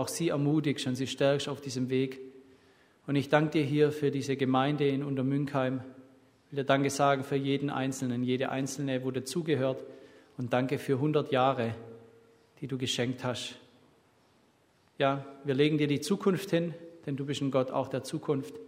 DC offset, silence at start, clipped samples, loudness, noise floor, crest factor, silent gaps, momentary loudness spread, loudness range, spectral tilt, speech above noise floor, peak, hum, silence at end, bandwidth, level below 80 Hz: under 0.1%; 0 s; under 0.1%; -30 LUFS; -67 dBFS; 22 dB; none; 12 LU; 4 LU; -5.5 dB/octave; 37 dB; -8 dBFS; none; 0 s; 16 kHz; -72 dBFS